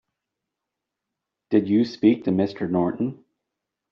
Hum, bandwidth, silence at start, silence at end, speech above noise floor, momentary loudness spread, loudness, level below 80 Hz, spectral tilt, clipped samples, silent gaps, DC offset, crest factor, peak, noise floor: none; 6.2 kHz; 1.5 s; 0.8 s; 63 dB; 7 LU; -23 LUFS; -66 dBFS; -7 dB/octave; under 0.1%; none; under 0.1%; 20 dB; -6 dBFS; -84 dBFS